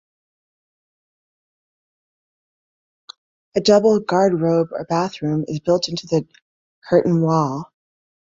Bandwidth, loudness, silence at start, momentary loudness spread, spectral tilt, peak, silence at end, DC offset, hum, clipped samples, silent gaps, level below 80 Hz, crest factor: 7.8 kHz; -19 LUFS; 3.55 s; 9 LU; -6.5 dB/octave; -2 dBFS; 0.65 s; under 0.1%; none; under 0.1%; 6.42-6.82 s; -60 dBFS; 20 dB